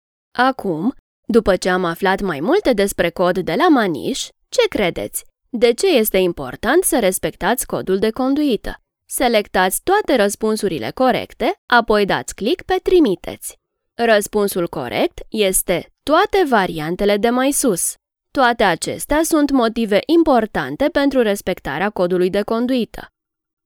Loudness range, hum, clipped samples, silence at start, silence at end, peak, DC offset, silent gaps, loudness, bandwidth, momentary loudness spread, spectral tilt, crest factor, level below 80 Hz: 2 LU; none; under 0.1%; 0.35 s; 0.6 s; 0 dBFS; under 0.1%; 0.99-1.23 s, 11.58-11.68 s; -17 LUFS; over 20 kHz; 8 LU; -4 dB/octave; 18 dB; -42 dBFS